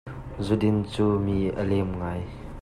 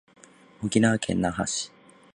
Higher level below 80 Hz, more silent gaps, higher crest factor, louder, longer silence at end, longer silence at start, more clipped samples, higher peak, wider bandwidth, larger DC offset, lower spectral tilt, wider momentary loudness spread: first, -42 dBFS vs -52 dBFS; neither; about the same, 16 dB vs 20 dB; about the same, -26 LUFS vs -26 LUFS; second, 0 s vs 0.5 s; second, 0.05 s vs 0.6 s; neither; second, -10 dBFS vs -6 dBFS; about the same, 11.5 kHz vs 11 kHz; neither; first, -8 dB/octave vs -4.5 dB/octave; about the same, 11 LU vs 12 LU